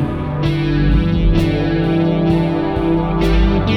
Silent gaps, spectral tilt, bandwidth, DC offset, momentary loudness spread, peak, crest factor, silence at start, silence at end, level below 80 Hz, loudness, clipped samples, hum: none; -8.5 dB/octave; 7 kHz; under 0.1%; 3 LU; -2 dBFS; 12 dB; 0 s; 0 s; -20 dBFS; -16 LUFS; under 0.1%; none